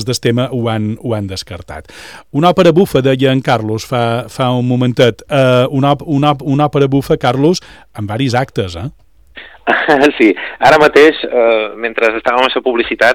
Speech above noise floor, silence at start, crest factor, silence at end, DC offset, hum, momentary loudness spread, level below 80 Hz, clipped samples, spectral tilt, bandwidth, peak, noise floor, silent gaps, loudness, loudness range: 25 dB; 0 s; 12 dB; 0 s; 0.5%; none; 13 LU; -44 dBFS; under 0.1%; -6 dB/octave; 18.5 kHz; 0 dBFS; -37 dBFS; none; -12 LUFS; 4 LU